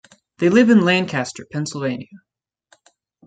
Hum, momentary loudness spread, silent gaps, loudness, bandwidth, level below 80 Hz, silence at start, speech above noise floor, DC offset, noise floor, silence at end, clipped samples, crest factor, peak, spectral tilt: none; 14 LU; none; -18 LUFS; 9.2 kHz; -64 dBFS; 0.4 s; 42 dB; under 0.1%; -59 dBFS; 1.1 s; under 0.1%; 18 dB; -2 dBFS; -5.5 dB/octave